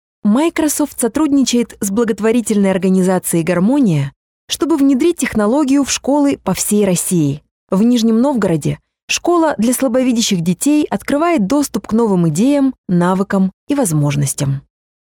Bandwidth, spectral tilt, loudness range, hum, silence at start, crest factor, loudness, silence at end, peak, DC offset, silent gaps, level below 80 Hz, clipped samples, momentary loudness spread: 18 kHz; -5.5 dB/octave; 1 LU; none; 0.25 s; 12 dB; -15 LUFS; 0.45 s; -2 dBFS; under 0.1%; 4.16-4.48 s, 7.51-7.67 s, 9.03-9.08 s, 12.78-12.84 s, 13.53-13.67 s; -48 dBFS; under 0.1%; 5 LU